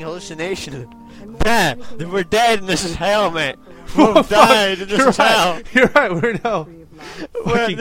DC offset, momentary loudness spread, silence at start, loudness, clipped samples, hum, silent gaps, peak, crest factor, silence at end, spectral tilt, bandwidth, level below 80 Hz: under 0.1%; 18 LU; 0 s; -16 LUFS; under 0.1%; none; none; 0 dBFS; 16 dB; 0 s; -4 dB/octave; 16.5 kHz; -38 dBFS